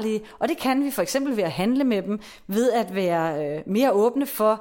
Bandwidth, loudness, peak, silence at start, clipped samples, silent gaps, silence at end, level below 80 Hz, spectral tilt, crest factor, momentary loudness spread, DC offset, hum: 17 kHz; -23 LUFS; -8 dBFS; 0 s; under 0.1%; none; 0 s; -60 dBFS; -5.5 dB/octave; 14 dB; 7 LU; under 0.1%; none